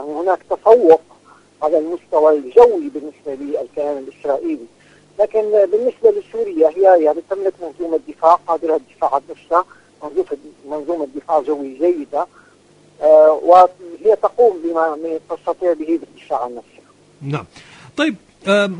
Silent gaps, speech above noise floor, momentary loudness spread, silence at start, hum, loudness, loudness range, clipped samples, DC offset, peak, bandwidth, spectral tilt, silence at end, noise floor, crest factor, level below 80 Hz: none; 34 dB; 16 LU; 0 s; 50 Hz at -60 dBFS; -16 LUFS; 7 LU; under 0.1%; under 0.1%; 0 dBFS; 10 kHz; -6.5 dB/octave; 0 s; -50 dBFS; 16 dB; -60 dBFS